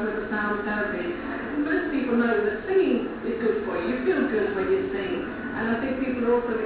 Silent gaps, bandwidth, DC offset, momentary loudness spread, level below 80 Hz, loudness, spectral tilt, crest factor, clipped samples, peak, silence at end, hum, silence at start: none; 4 kHz; under 0.1%; 7 LU; -50 dBFS; -26 LUFS; -10 dB/octave; 14 dB; under 0.1%; -12 dBFS; 0 s; none; 0 s